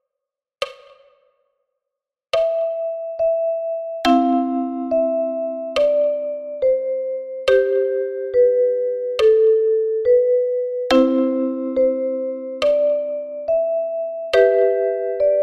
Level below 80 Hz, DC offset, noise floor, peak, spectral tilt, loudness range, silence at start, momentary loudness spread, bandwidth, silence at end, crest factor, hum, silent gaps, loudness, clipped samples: -56 dBFS; under 0.1%; -85 dBFS; -4 dBFS; -4.5 dB/octave; 5 LU; 0.6 s; 10 LU; 10.5 kHz; 0 s; 16 dB; none; none; -19 LUFS; under 0.1%